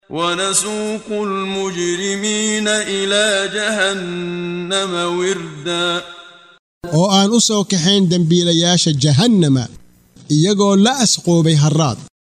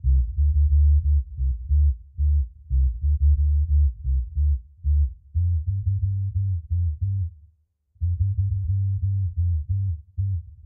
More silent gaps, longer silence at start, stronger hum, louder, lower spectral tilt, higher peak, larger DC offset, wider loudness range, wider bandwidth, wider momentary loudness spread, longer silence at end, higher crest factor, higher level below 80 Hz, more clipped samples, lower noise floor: first, 6.59-6.81 s vs none; about the same, 0.1 s vs 0.05 s; neither; first, -15 LUFS vs -24 LUFS; second, -4 dB/octave vs -28.5 dB/octave; first, -2 dBFS vs -12 dBFS; neither; about the same, 5 LU vs 4 LU; first, 13.5 kHz vs 0.3 kHz; about the same, 10 LU vs 8 LU; first, 0.35 s vs 0.05 s; about the same, 14 dB vs 10 dB; second, -54 dBFS vs -24 dBFS; neither; second, -43 dBFS vs -63 dBFS